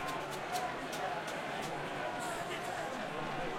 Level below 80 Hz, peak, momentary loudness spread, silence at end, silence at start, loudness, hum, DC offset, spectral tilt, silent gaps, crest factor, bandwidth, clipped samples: -62 dBFS; -24 dBFS; 2 LU; 0 s; 0 s; -39 LUFS; none; under 0.1%; -3.5 dB/octave; none; 16 dB; 16.5 kHz; under 0.1%